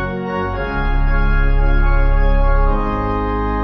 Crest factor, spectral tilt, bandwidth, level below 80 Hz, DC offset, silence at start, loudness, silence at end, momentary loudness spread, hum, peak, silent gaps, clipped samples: 10 dB; -9 dB/octave; 5.2 kHz; -16 dBFS; under 0.1%; 0 s; -19 LUFS; 0 s; 4 LU; none; -4 dBFS; none; under 0.1%